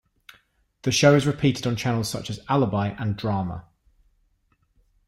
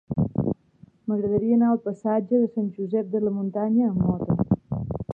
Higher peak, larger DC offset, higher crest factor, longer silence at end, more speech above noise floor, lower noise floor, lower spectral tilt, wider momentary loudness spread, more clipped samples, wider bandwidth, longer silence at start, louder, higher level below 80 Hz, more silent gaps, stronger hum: first, -4 dBFS vs -8 dBFS; neither; about the same, 20 dB vs 16 dB; first, 1.45 s vs 0 s; first, 45 dB vs 31 dB; first, -67 dBFS vs -54 dBFS; second, -5.5 dB/octave vs -12.5 dB/octave; first, 13 LU vs 8 LU; neither; first, 16 kHz vs 2.4 kHz; first, 0.85 s vs 0.1 s; about the same, -23 LUFS vs -24 LUFS; about the same, -52 dBFS vs -48 dBFS; neither; neither